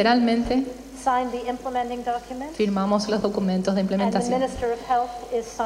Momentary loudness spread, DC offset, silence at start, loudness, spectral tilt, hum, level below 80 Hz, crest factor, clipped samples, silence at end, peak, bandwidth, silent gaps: 7 LU; under 0.1%; 0 s; -24 LUFS; -5.5 dB/octave; none; -46 dBFS; 18 dB; under 0.1%; 0 s; -6 dBFS; 14 kHz; none